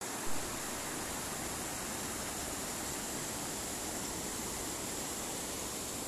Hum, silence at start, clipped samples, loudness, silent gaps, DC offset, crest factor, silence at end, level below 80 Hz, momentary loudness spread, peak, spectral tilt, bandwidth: none; 0 s; under 0.1%; -38 LUFS; none; under 0.1%; 16 dB; 0 s; -56 dBFS; 1 LU; -24 dBFS; -2 dB/octave; 14 kHz